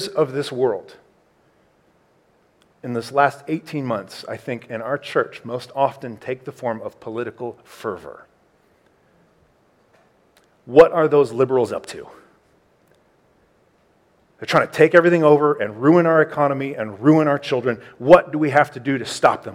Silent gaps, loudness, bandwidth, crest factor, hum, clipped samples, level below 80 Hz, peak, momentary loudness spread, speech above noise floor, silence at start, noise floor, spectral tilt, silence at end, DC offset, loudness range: none; -19 LUFS; 14.5 kHz; 20 dB; none; under 0.1%; -60 dBFS; 0 dBFS; 17 LU; 41 dB; 0 s; -60 dBFS; -6.5 dB/octave; 0 s; under 0.1%; 14 LU